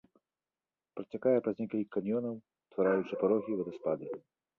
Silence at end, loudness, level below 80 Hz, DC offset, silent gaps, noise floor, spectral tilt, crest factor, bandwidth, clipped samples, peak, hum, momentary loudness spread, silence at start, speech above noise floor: 0.4 s; -33 LUFS; -76 dBFS; under 0.1%; none; under -90 dBFS; -9.5 dB/octave; 18 dB; 6 kHz; under 0.1%; -16 dBFS; none; 15 LU; 0.95 s; over 57 dB